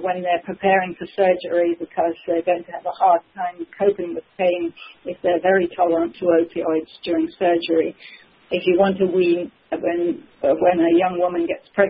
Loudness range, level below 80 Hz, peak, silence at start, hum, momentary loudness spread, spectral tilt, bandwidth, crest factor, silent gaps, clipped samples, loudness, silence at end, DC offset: 2 LU; -60 dBFS; -2 dBFS; 0 s; none; 10 LU; -11 dB/octave; 5.2 kHz; 18 dB; none; under 0.1%; -20 LUFS; 0 s; under 0.1%